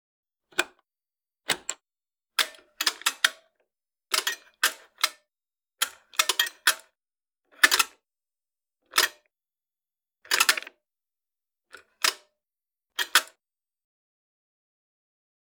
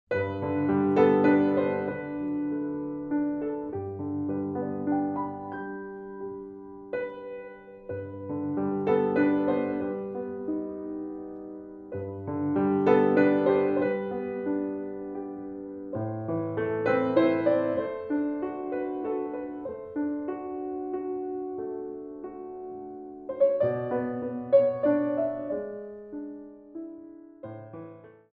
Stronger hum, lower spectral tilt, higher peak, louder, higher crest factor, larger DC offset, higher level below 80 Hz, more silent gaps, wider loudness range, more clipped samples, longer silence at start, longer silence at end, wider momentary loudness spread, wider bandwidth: neither; second, 2.5 dB/octave vs -10 dB/octave; first, -2 dBFS vs -8 dBFS; first, -25 LUFS vs -28 LUFS; first, 30 dB vs 20 dB; neither; second, -78 dBFS vs -66 dBFS; neither; second, 4 LU vs 9 LU; neither; first, 0.6 s vs 0.1 s; first, 2.35 s vs 0.2 s; second, 15 LU vs 18 LU; first, over 20 kHz vs 4.8 kHz